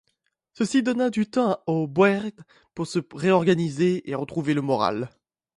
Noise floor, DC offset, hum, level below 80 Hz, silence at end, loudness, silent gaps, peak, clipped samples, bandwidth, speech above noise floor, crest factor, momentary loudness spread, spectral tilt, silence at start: -74 dBFS; under 0.1%; none; -64 dBFS; 0.5 s; -24 LUFS; none; -6 dBFS; under 0.1%; 11.5 kHz; 51 dB; 18 dB; 10 LU; -6.5 dB/octave; 0.6 s